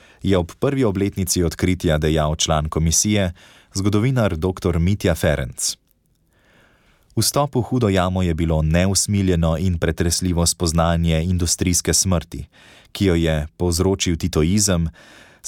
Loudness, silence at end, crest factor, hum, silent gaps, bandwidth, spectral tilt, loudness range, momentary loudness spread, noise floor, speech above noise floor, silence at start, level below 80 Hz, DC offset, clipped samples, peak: -19 LUFS; 0 s; 14 dB; none; none; 17.5 kHz; -4.5 dB/octave; 3 LU; 5 LU; -62 dBFS; 43 dB; 0.25 s; -32 dBFS; under 0.1%; under 0.1%; -6 dBFS